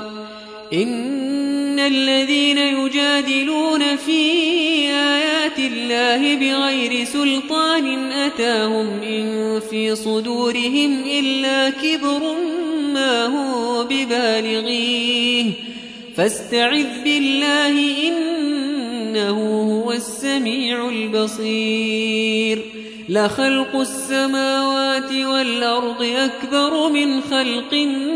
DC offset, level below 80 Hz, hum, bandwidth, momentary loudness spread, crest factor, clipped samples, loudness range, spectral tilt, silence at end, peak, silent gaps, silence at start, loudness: under 0.1%; -62 dBFS; none; 11 kHz; 6 LU; 14 dB; under 0.1%; 3 LU; -3 dB/octave; 0 s; -4 dBFS; none; 0 s; -18 LUFS